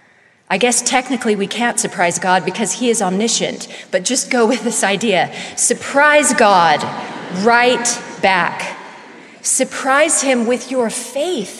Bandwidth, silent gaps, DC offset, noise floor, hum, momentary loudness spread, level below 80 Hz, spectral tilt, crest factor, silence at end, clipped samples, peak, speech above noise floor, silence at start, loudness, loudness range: 14 kHz; none; under 0.1%; -51 dBFS; none; 11 LU; -62 dBFS; -2.5 dB/octave; 16 dB; 0 s; under 0.1%; 0 dBFS; 36 dB; 0.5 s; -15 LUFS; 3 LU